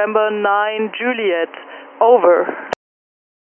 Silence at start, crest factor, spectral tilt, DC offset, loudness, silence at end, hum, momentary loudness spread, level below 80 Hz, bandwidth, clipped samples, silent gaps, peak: 0 s; 16 dB; -5.5 dB/octave; under 0.1%; -16 LUFS; 0.85 s; none; 17 LU; -70 dBFS; 7.2 kHz; under 0.1%; none; 0 dBFS